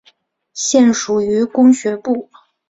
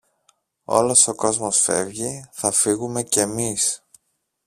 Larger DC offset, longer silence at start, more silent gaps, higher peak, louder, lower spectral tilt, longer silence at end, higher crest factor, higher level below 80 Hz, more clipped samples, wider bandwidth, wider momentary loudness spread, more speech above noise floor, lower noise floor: neither; second, 0.55 s vs 0.7 s; neither; about the same, -2 dBFS vs -2 dBFS; first, -15 LUFS vs -19 LUFS; first, -4 dB/octave vs -2.5 dB/octave; second, 0.45 s vs 0.7 s; second, 14 dB vs 20 dB; about the same, -58 dBFS vs -58 dBFS; neither; second, 8 kHz vs 15.5 kHz; about the same, 10 LU vs 11 LU; second, 41 dB vs 50 dB; second, -55 dBFS vs -71 dBFS